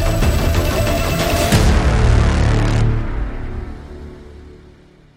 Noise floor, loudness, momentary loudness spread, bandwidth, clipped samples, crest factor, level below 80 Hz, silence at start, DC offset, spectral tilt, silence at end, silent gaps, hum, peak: -45 dBFS; -16 LUFS; 18 LU; 16 kHz; under 0.1%; 14 dB; -20 dBFS; 0 s; under 0.1%; -5.5 dB/octave; 0.6 s; none; none; -2 dBFS